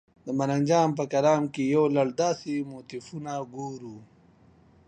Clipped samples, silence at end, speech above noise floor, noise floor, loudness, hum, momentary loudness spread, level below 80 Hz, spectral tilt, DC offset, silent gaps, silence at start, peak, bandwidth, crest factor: under 0.1%; 0.85 s; 31 dB; -58 dBFS; -26 LUFS; none; 15 LU; -68 dBFS; -6 dB/octave; under 0.1%; none; 0.25 s; -10 dBFS; 9.6 kHz; 18 dB